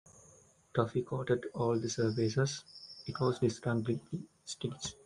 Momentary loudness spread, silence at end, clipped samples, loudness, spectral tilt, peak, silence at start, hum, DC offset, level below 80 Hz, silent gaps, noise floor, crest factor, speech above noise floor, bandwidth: 12 LU; 0.15 s; under 0.1%; -35 LUFS; -6 dB/octave; -14 dBFS; 0.75 s; none; under 0.1%; -66 dBFS; none; -63 dBFS; 20 dB; 29 dB; 11 kHz